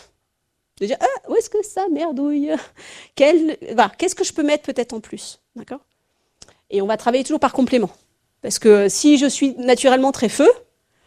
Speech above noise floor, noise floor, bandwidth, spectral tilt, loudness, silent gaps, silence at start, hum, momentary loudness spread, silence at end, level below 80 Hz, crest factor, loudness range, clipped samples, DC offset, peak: 56 dB; -73 dBFS; 14.5 kHz; -3.5 dB/octave; -18 LUFS; none; 0.8 s; none; 19 LU; 0.5 s; -58 dBFS; 18 dB; 7 LU; under 0.1%; under 0.1%; 0 dBFS